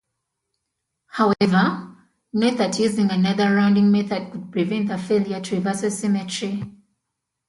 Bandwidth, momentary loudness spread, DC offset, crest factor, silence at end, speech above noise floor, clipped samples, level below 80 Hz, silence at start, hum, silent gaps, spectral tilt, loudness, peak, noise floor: 11.5 kHz; 11 LU; under 0.1%; 18 dB; 0.75 s; 60 dB; under 0.1%; -62 dBFS; 1.15 s; none; none; -6 dB/octave; -21 LUFS; -4 dBFS; -80 dBFS